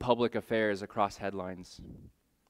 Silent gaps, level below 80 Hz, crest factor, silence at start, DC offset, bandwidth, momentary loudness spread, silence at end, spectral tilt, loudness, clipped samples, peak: none; -60 dBFS; 24 dB; 0 s; under 0.1%; 15.5 kHz; 19 LU; 0.4 s; -5.5 dB/octave; -33 LUFS; under 0.1%; -10 dBFS